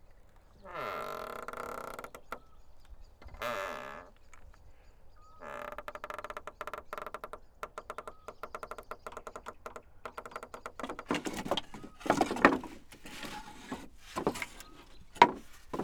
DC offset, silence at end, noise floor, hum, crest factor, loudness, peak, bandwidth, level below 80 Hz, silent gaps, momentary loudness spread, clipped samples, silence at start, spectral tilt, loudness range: under 0.1%; 0 s; -57 dBFS; none; 36 dB; -36 LUFS; -2 dBFS; over 20 kHz; -58 dBFS; none; 22 LU; under 0.1%; 0.05 s; -4 dB/octave; 12 LU